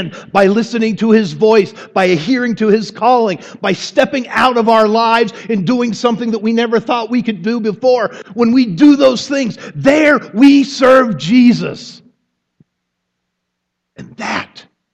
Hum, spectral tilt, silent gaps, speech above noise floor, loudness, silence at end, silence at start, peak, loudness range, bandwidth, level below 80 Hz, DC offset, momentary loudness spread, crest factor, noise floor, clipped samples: none; -5.5 dB/octave; none; 61 dB; -12 LUFS; 0.5 s; 0 s; 0 dBFS; 5 LU; 9.2 kHz; -54 dBFS; under 0.1%; 9 LU; 12 dB; -74 dBFS; under 0.1%